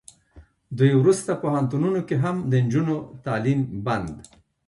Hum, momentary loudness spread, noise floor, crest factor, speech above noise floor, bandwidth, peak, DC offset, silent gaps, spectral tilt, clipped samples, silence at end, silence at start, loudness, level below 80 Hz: none; 10 LU; -52 dBFS; 18 dB; 30 dB; 11.5 kHz; -6 dBFS; under 0.1%; none; -7.5 dB/octave; under 0.1%; 0.45 s; 0.35 s; -23 LUFS; -54 dBFS